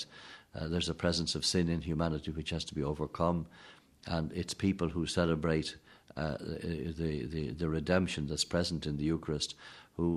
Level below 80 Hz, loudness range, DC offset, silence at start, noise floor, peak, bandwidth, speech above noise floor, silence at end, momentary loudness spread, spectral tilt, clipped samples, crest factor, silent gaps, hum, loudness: -50 dBFS; 2 LU; under 0.1%; 0 s; -54 dBFS; -14 dBFS; 12 kHz; 20 dB; 0 s; 11 LU; -5 dB/octave; under 0.1%; 20 dB; none; none; -34 LUFS